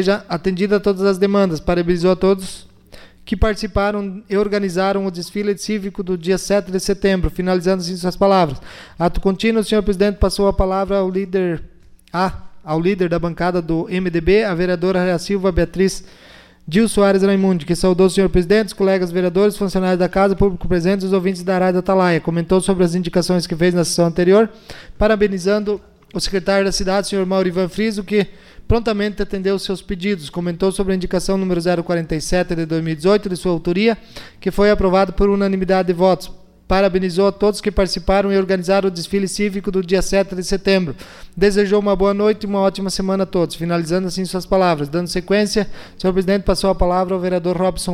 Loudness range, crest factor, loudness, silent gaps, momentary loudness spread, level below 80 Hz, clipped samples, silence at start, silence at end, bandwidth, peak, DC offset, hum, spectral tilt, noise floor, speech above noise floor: 4 LU; 14 dB; -18 LUFS; none; 7 LU; -32 dBFS; under 0.1%; 0 s; 0 s; 14.5 kHz; -4 dBFS; under 0.1%; none; -6 dB/octave; -42 dBFS; 25 dB